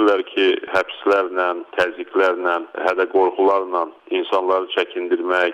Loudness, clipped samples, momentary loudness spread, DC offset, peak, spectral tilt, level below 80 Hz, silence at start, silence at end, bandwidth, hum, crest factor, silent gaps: -20 LUFS; under 0.1%; 5 LU; under 0.1%; -6 dBFS; -4 dB/octave; -66 dBFS; 0 s; 0 s; 8.8 kHz; none; 14 dB; none